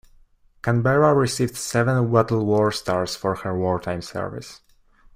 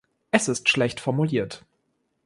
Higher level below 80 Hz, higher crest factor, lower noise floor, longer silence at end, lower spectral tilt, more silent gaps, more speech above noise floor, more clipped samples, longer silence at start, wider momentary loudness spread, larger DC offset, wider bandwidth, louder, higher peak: first, -52 dBFS vs -60 dBFS; about the same, 18 dB vs 22 dB; second, -55 dBFS vs -73 dBFS; about the same, 0.6 s vs 0.65 s; first, -6 dB/octave vs -4.5 dB/octave; neither; second, 34 dB vs 48 dB; neither; first, 0.65 s vs 0.35 s; about the same, 12 LU vs 11 LU; neither; first, 16 kHz vs 11.5 kHz; about the same, -22 LUFS vs -23 LUFS; about the same, -4 dBFS vs -4 dBFS